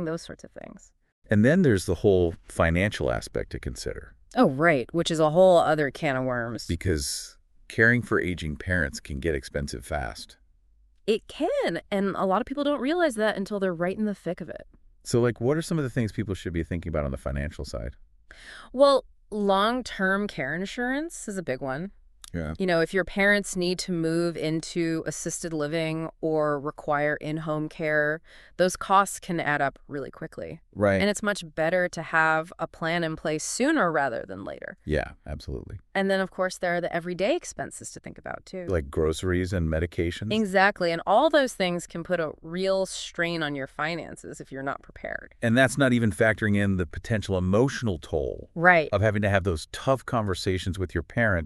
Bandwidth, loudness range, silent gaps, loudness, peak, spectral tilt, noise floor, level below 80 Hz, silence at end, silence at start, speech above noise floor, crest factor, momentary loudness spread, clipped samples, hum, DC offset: 13.5 kHz; 5 LU; 1.12-1.22 s; -26 LUFS; -4 dBFS; -5.5 dB/octave; -60 dBFS; -44 dBFS; 0 s; 0 s; 34 dB; 22 dB; 15 LU; under 0.1%; none; under 0.1%